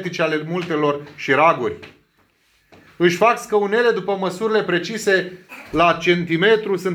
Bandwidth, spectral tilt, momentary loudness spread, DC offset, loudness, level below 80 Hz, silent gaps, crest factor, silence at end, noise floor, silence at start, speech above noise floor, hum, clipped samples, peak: 15.5 kHz; -5 dB/octave; 9 LU; under 0.1%; -18 LUFS; -54 dBFS; none; 16 dB; 0 s; -61 dBFS; 0 s; 42 dB; none; under 0.1%; -2 dBFS